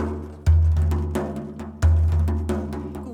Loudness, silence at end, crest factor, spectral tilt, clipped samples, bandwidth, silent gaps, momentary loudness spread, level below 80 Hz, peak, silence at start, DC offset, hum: -23 LUFS; 0 s; 14 dB; -8.5 dB/octave; under 0.1%; 10 kHz; none; 12 LU; -24 dBFS; -8 dBFS; 0 s; under 0.1%; none